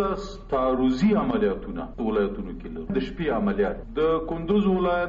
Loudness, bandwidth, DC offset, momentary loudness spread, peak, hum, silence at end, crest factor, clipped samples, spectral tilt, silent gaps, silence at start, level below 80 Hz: -25 LUFS; 7.4 kHz; under 0.1%; 11 LU; -10 dBFS; none; 0 s; 14 dB; under 0.1%; -6 dB/octave; none; 0 s; -40 dBFS